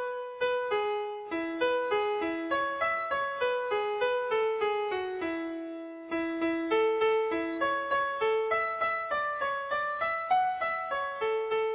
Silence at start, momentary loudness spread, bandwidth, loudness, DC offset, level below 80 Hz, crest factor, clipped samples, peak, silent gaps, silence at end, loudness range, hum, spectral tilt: 0 s; 6 LU; 4 kHz; -30 LUFS; under 0.1%; -66 dBFS; 14 dB; under 0.1%; -16 dBFS; none; 0 s; 2 LU; none; -0.5 dB/octave